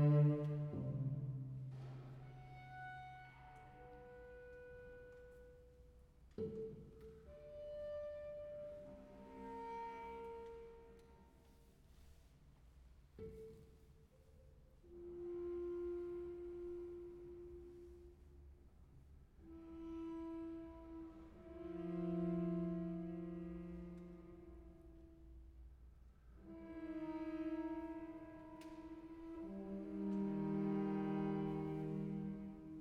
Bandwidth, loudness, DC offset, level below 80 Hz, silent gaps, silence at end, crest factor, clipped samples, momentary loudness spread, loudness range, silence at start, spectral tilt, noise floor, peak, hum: 5.2 kHz; -47 LUFS; under 0.1%; -64 dBFS; none; 0 s; 20 dB; under 0.1%; 24 LU; 14 LU; 0 s; -10 dB/octave; -67 dBFS; -26 dBFS; none